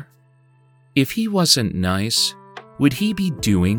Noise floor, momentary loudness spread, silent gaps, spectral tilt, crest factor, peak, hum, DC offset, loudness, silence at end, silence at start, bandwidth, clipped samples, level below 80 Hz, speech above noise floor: -55 dBFS; 7 LU; none; -4 dB/octave; 18 dB; -2 dBFS; none; under 0.1%; -19 LUFS; 0 s; 0 s; over 20 kHz; under 0.1%; -48 dBFS; 36 dB